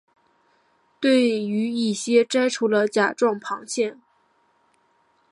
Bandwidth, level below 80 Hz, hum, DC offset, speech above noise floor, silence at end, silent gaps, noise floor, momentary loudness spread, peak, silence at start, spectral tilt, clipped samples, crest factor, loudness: 11.5 kHz; -78 dBFS; none; under 0.1%; 43 dB; 1.4 s; none; -64 dBFS; 7 LU; -6 dBFS; 1 s; -4 dB/octave; under 0.1%; 18 dB; -22 LUFS